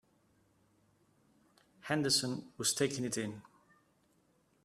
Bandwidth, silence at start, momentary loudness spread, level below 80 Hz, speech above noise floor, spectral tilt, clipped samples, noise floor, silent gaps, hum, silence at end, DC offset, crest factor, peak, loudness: 15 kHz; 1.85 s; 15 LU; -76 dBFS; 38 dB; -3 dB/octave; under 0.1%; -73 dBFS; none; none; 1.25 s; under 0.1%; 24 dB; -16 dBFS; -34 LUFS